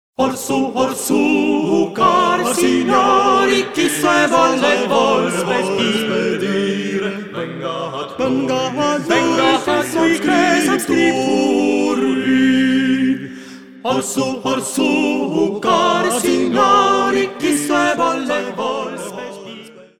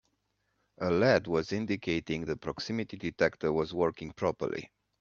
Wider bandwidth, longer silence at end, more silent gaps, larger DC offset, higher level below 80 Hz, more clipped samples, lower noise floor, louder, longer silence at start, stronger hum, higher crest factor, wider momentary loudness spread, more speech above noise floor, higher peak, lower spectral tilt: first, 16.5 kHz vs 7.4 kHz; second, 0.15 s vs 0.35 s; neither; first, 0.2% vs under 0.1%; about the same, -60 dBFS vs -60 dBFS; neither; second, -37 dBFS vs -78 dBFS; first, -16 LUFS vs -31 LUFS; second, 0.2 s vs 0.8 s; neither; second, 16 dB vs 22 dB; about the same, 11 LU vs 10 LU; second, 22 dB vs 47 dB; first, 0 dBFS vs -10 dBFS; second, -4 dB/octave vs -6 dB/octave